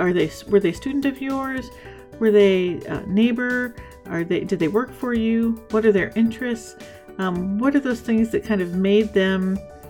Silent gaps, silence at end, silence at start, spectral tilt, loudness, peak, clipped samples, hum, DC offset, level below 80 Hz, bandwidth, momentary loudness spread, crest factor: none; 0 s; 0 s; -6.5 dB/octave; -21 LUFS; -4 dBFS; under 0.1%; none; under 0.1%; -48 dBFS; 17 kHz; 12 LU; 16 dB